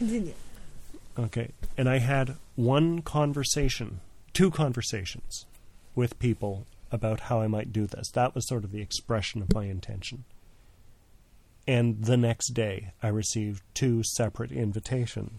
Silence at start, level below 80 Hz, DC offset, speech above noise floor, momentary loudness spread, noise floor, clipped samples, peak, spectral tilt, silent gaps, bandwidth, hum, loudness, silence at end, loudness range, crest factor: 0 s; -44 dBFS; under 0.1%; 29 dB; 12 LU; -57 dBFS; under 0.1%; -8 dBFS; -5.5 dB/octave; none; 14 kHz; none; -29 LUFS; 0 s; 4 LU; 20 dB